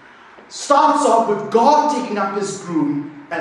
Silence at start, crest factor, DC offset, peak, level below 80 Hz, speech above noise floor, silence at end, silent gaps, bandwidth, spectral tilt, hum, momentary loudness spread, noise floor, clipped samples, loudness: 0.4 s; 18 dB; under 0.1%; 0 dBFS; -68 dBFS; 27 dB; 0 s; none; 11.5 kHz; -4.5 dB/octave; none; 13 LU; -43 dBFS; under 0.1%; -17 LUFS